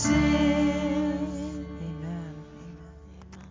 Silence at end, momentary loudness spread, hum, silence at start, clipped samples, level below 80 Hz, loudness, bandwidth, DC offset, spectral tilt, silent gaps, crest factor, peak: 0 s; 24 LU; none; 0 s; under 0.1%; -40 dBFS; -27 LUFS; 7.6 kHz; under 0.1%; -5.5 dB/octave; none; 18 dB; -10 dBFS